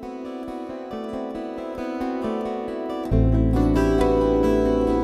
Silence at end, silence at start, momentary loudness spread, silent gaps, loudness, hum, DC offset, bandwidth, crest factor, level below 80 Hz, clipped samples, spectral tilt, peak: 0 s; 0 s; 13 LU; none; -23 LUFS; none; under 0.1%; 13 kHz; 14 dB; -30 dBFS; under 0.1%; -8.5 dB/octave; -8 dBFS